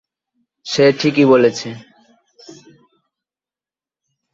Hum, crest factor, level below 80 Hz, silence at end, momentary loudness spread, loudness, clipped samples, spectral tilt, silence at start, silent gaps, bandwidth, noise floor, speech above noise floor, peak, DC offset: none; 18 dB; -62 dBFS; 2.55 s; 22 LU; -14 LUFS; under 0.1%; -5.5 dB/octave; 0.65 s; none; 7.8 kHz; under -90 dBFS; over 76 dB; -2 dBFS; under 0.1%